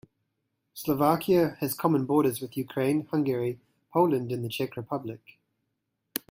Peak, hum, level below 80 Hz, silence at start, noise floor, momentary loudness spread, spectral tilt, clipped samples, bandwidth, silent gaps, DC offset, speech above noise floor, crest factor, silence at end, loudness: -6 dBFS; none; -66 dBFS; 0.75 s; -80 dBFS; 12 LU; -6.5 dB/octave; under 0.1%; 16.5 kHz; none; under 0.1%; 54 dB; 22 dB; 0.15 s; -28 LUFS